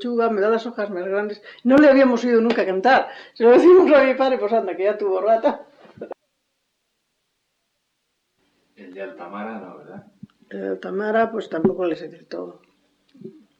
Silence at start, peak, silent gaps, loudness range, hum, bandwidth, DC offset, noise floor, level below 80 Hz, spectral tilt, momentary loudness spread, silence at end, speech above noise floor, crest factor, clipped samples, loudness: 0 s; -4 dBFS; none; 23 LU; none; 7.6 kHz; under 0.1%; -73 dBFS; -64 dBFS; -6.5 dB/octave; 22 LU; 0.3 s; 55 dB; 16 dB; under 0.1%; -18 LUFS